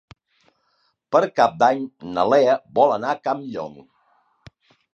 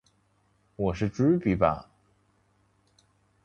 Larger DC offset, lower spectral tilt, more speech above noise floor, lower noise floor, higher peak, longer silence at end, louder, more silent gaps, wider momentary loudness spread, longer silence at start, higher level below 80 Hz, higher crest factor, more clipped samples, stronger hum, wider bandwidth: neither; second, -5.5 dB/octave vs -8.5 dB/octave; first, 48 dB vs 43 dB; about the same, -68 dBFS vs -68 dBFS; first, -2 dBFS vs -8 dBFS; second, 1.25 s vs 1.65 s; first, -20 LUFS vs -27 LUFS; neither; first, 12 LU vs 8 LU; first, 1.1 s vs 0.8 s; second, -64 dBFS vs -50 dBFS; about the same, 20 dB vs 22 dB; neither; second, none vs 50 Hz at -50 dBFS; about the same, 8 kHz vs 7.6 kHz